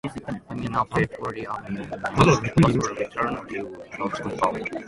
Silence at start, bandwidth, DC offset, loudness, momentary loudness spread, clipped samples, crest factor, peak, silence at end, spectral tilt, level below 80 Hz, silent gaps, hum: 0.05 s; 11.5 kHz; under 0.1%; -25 LUFS; 14 LU; under 0.1%; 22 dB; -4 dBFS; 0 s; -6 dB/octave; -46 dBFS; none; none